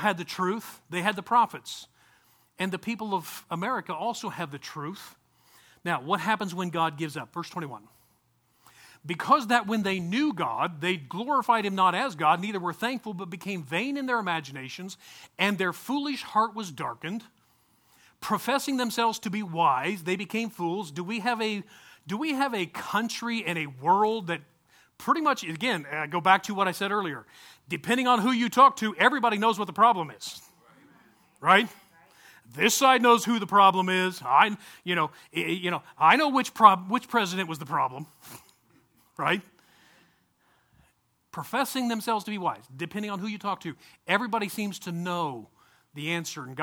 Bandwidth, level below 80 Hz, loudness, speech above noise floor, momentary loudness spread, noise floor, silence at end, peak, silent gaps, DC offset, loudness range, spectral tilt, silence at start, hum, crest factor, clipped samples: 19.5 kHz; -74 dBFS; -26 LUFS; 42 dB; 16 LU; -69 dBFS; 0 s; -2 dBFS; none; under 0.1%; 10 LU; -4 dB/octave; 0 s; none; 26 dB; under 0.1%